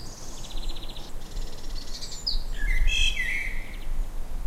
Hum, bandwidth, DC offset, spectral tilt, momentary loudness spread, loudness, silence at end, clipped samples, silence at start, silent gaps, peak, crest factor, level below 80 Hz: none; 13.5 kHz; under 0.1%; -2 dB/octave; 16 LU; -31 LUFS; 0 s; under 0.1%; 0 s; none; -10 dBFS; 16 dB; -28 dBFS